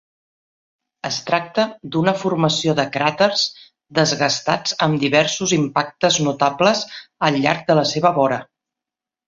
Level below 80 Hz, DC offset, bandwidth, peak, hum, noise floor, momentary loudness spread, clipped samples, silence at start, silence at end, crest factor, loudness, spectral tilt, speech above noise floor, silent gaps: -60 dBFS; under 0.1%; 7.8 kHz; -2 dBFS; none; -87 dBFS; 6 LU; under 0.1%; 1.05 s; 0.85 s; 18 dB; -18 LUFS; -4 dB/octave; 69 dB; none